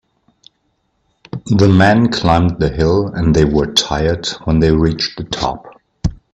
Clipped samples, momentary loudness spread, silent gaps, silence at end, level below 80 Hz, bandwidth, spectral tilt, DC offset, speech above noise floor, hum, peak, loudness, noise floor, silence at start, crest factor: under 0.1%; 13 LU; none; 0.2 s; -30 dBFS; 11.5 kHz; -6 dB/octave; under 0.1%; 51 dB; none; 0 dBFS; -14 LUFS; -64 dBFS; 1.35 s; 14 dB